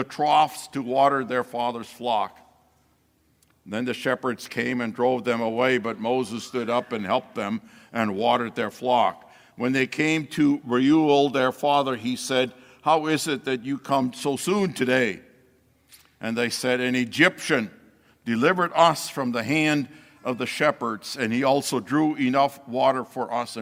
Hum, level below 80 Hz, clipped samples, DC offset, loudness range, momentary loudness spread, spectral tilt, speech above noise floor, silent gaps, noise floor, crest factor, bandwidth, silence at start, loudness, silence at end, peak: none; -68 dBFS; under 0.1%; under 0.1%; 5 LU; 10 LU; -4.5 dB/octave; 41 dB; none; -65 dBFS; 20 dB; 16.5 kHz; 0 s; -24 LUFS; 0 s; -4 dBFS